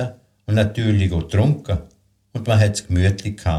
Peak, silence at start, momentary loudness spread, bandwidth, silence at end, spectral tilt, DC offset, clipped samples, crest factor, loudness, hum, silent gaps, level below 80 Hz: -4 dBFS; 0 s; 11 LU; 11.5 kHz; 0 s; -6.5 dB/octave; under 0.1%; under 0.1%; 16 dB; -20 LUFS; none; none; -36 dBFS